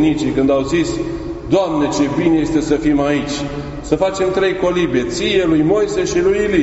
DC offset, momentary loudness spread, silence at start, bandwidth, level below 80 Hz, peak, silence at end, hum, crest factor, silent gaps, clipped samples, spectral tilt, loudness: under 0.1%; 8 LU; 0 s; 8 kHz; -36 dBFS; 0 dBFS; 0 s; none; 16 dB; none; under 0.1%; -5 dB/octave; -16 LUFS